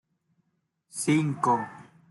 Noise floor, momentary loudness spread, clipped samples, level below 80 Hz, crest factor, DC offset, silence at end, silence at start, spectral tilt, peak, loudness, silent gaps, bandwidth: -76 dBFS; 15 LU; under 0.1%; -72 dBFS; 18 dB; under 0.1%; 0.3 s; 0.95 s; -5.5 dB/octave; -10 dBFS; -26 LUFS; none; 11.5 kHz